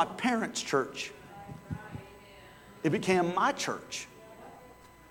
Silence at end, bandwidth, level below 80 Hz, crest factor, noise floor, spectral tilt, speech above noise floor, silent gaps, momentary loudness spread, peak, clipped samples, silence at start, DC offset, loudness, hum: 0.05 s; 18.5 kHz; -62 dBFS; 20 dB; -54 dBFS; -4 dB/octave; 24 dB; none; 24 LU; -12 dBFS; under 0.1%; 0 s; under 0.1%; -31 LUFS; none